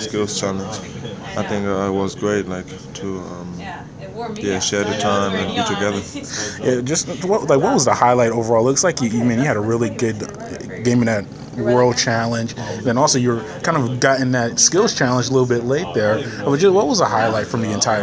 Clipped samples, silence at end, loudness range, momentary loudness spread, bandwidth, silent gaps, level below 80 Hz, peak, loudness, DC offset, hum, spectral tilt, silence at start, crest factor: under 0.1%; 0 s; 7 LU; 14 LU; 8 kHz; none; -48 dBFS; 0 dBFS; -18 LUFS; under 0.1%; none; -4 dB/octave; 0 s; 18 dB